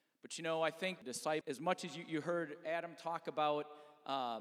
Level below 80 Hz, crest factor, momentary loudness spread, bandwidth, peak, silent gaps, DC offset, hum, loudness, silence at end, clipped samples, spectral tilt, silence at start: under -90 dBFS; 22 dB; 7 LU; 15.5 kHz; -20 dBFS; none; under 0.1%; none; -40 LUFS; 0 s; under 0.1%; -4 dB/octave; 0.25 s